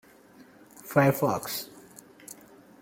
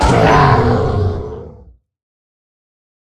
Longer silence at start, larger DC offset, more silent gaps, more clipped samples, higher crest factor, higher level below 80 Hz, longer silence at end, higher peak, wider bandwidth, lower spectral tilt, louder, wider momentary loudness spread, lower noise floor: first, 0.85 s vs 0 s; neither; neither; neither; first, 24 dB vs 16 dB; second, -68 dBFS vs -28 dBFS; second, 0.5 s vs 1.6 s; second, -8 dBFS vs 0 dBFS; first, 17 kHz vs 12 kHz; about the same, -5.5 dB/octave vs -6.5 dB/octave; second, -26 LUFS vs -12 LUFS; first, 24 LU vs 18 LU; first, -54 dBFS vs -43 dBFS